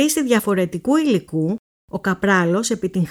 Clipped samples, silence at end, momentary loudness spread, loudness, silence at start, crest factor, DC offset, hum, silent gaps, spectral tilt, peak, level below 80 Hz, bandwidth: under 0.1%; 0 s; 8 LU; -19 LUFS; 0 s; 16 dB; under 0.1%; none; 1.59-1.88 s; -5 dB/octave; -4 dBFS; -54 dBFS; over 20 kHz